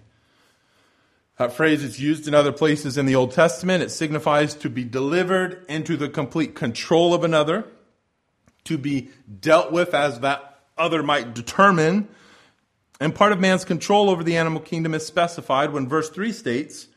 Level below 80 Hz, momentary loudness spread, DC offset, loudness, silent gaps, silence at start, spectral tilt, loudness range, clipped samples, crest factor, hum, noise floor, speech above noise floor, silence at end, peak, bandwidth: -62 dBFS; 10 LU; under 0.1%; -21 LUFS; none; 1.4 s; -5.5 dB/octave; 3 LU; under 0.1%; 20 dB; none; -70 dBFS; 49 dB; 0.15 s; -2 dBFS; 14 kHz